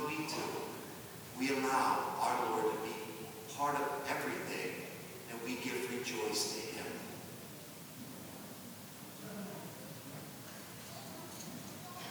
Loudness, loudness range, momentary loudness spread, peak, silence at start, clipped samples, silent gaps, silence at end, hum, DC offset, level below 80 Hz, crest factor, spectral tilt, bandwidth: -40 LUFS; 11 LU; 14 LU; -20 dBFS; 0 s; under 0.1%; none; 0 s; none; under 0.1%; -78 dBFS; 20 dB; -3.5 dB/octave; over 20 kHz